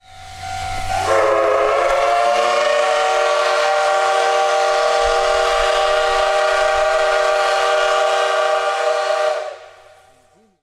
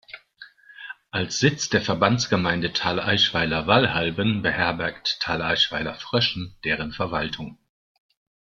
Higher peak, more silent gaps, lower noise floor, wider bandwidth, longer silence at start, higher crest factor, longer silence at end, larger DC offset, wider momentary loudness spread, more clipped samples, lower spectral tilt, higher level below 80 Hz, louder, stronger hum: about the same, -4 dBFS vs -2 dBFS; neither; first, -54 dBFS vs -49 dBFS; first, 13.5 kHz vs 7.6 kHz; about the same, 0.1 s vs 0.1 s; second, 12 dB vs 22 dB; about the same, 0.9 s vs 1 s; neither; second, 5 LU vs 11 LU; neither; second, -1.5 dB/octave vs -4 dB/octave; first, -40 dBFS vs -52 dBFS; first, -16 LUFS vs -23 LUFS; neither